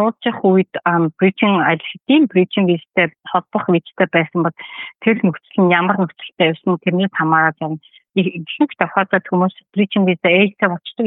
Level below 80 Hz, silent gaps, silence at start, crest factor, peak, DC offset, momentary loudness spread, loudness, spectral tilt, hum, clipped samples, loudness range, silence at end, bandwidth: -70 dBFS; none; 0 s; 16 dB; -2 dBFS; under 0.1%; 7 LU; -17 LUFS; -11 dB/octave; none; under 0.1%; 2 LU; 0 s; 4 kHz